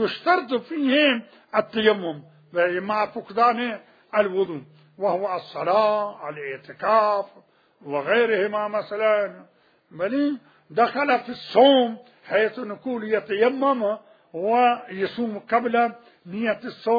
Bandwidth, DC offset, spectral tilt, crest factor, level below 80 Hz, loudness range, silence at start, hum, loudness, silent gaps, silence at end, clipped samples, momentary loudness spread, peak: 5 kHz; under 0.1%; -7 dB/octave; 20 dB; -74 dBFS; 3 LU; 0 s; none; -23 LUFS; none; 0 s; under 0.1%; 12 LU; -4 dBFS